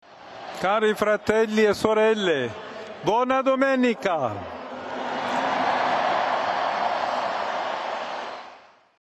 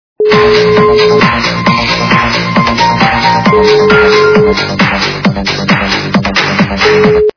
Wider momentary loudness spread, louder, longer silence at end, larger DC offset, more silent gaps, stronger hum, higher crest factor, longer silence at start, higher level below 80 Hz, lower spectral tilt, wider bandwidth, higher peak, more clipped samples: first, 14 LU vs 5 LU; second, -24 LUFS vs -8 LUFS; first, 0.4 s vs 0.05 s; neither; neither; neither; first, 20 dB vs 8 dB; about the same, 0.1 s vs 0.2 s; second, -62 dBFS vs -30 dBFS; about the same, -4.5 dB/octave vs -5.5 dB/octave; first, 13 kHz vs 5.4 kHz; second, -4 dBFS vs 0 dBFS; second, under 0.1% vs 1%